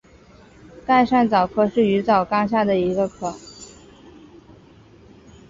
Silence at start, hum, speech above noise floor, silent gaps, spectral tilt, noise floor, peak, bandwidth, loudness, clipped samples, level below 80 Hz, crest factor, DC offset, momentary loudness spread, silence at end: 0.75 s; none; 30 dB; none; -6.5 dB/octave; -49 dBFS; -4 dBFS; 7.8 kHz; -19 LUFS; under 0.1%; -52 dBFS; 18 dB; under 0.1%; 21 LU; 1.85 s